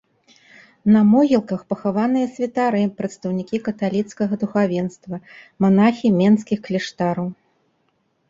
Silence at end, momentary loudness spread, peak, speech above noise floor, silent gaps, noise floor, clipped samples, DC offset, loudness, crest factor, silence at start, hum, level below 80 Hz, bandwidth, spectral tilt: 0.95 s; 11 LU; -4 dBFS; 48 dB; none; -67 dBFS; under 0.1%; under 0.1%; -20 LUFS; 16 dB; 0.85 s; none; -60 dBFS; 7.6 kHz; -7.5 dB/octave